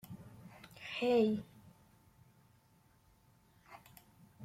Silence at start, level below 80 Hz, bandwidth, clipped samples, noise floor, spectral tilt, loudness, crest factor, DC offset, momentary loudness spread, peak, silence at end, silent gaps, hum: 0.05 s; -74 dBFS; 16 kHz; under 0.1%; -69 dBFS; -6 dB/octave; -35 LUFS; 20 dB; under 0.1%; 28 LU; -20 dBFS; 0 s; none; none